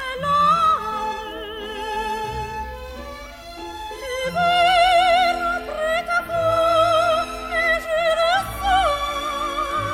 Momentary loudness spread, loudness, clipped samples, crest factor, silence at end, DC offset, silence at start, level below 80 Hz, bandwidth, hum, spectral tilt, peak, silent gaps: 17 LU; -20 LUFS; under 0.1%; 14 dB; 0 s; under 0.1%; 0 s; -40 dBFS; 16.5 kHz; none; -3.5 dB/octave; -6 dBFS; none